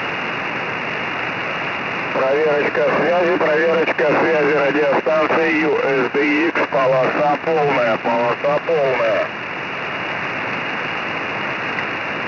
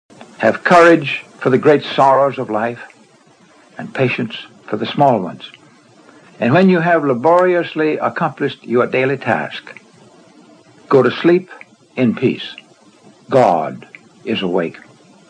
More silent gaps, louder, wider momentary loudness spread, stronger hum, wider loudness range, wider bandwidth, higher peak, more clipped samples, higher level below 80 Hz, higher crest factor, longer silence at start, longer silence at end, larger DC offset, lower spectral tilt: neither; second, -18 LUFS vs -15 LUFS; second, 6 LU vs 16 LU; neither; about the same, 4 LU vs 6 LU; second, 6 kHz vs 10 kHz; second, -8 dBFS vs 0 dBFS; neither; about the same, -60 dBFS vs -64 dBFS; second, 10 dB vs 16 dB; second, 0 s vs 0.2 s; second, 0 s vs 0.6 s; neither; about the same, -6 dB/octave vs -7 dB/octave